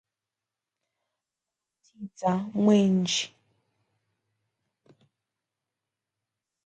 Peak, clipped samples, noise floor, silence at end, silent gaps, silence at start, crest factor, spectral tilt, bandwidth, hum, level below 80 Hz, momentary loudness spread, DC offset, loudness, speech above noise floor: -10 dBFS; under 0.1%; -89 dBFS; 3.4 s; none; 2 s; 20 dB; -5.5 dB/octave; 9.2 kHz; none; -74 dBFS; 20 LU; under 0.1%; -25 LUFS; 64 dB